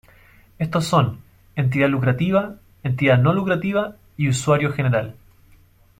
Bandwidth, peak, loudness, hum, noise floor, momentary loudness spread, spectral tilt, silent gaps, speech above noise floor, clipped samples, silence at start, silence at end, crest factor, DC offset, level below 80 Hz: 14.5 kHz; -4 dBFS; -20 LUFS; none; -52 dBFS; 13 LU; -6.5 dB/octave; none; 33 dB; under 0.1%; 0.6 s; 0.9 s; 18 dB; under 0.1%; -52 dBFS